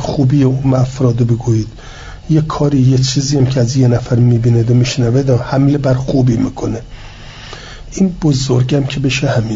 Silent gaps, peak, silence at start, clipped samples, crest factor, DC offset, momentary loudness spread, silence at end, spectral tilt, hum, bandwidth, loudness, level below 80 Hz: none; -2 dBFS; 0 s; under 0.1%; 10 dB; under 0.1%; 19 LU; 0 s; -6.5 dB/octave; none; 7.8 kHz; -13 LUFS; -34 dBFS